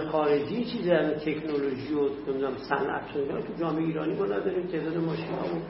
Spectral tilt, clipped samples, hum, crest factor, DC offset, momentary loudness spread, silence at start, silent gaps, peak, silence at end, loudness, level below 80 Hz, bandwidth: -10.5 dB/octave; under 0.1%; none; 18 dB; under 0.1%; 6 LU; 0 s; none; -10 dBFS; 0 s; -29 LUFS; -58 dBFS; 5.8 kHz